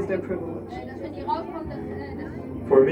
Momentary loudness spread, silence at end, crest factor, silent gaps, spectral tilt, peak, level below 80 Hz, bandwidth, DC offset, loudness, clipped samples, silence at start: 12 LU; 0 s; 22 dB; none; -9 dB/octave; -4 dBFS; -48 dBFS; 5.6 kHz; under 0.1%; -29 LUFS; under 0.1%; 0 s